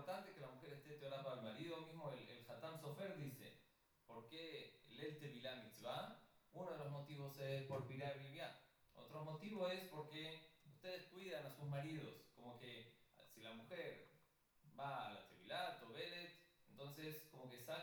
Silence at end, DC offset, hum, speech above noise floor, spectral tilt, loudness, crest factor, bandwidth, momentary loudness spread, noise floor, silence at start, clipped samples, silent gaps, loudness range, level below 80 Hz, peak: 0 s; under 0.1%; none; 26 dB; -5.5 dB/octave; -53 LUFS; 20 dB; 19.5 kHz; 11 LU; -77 dBFS; 0 s; under 0.1%; none; 4 LU; -88 dBFS; -34 dBFS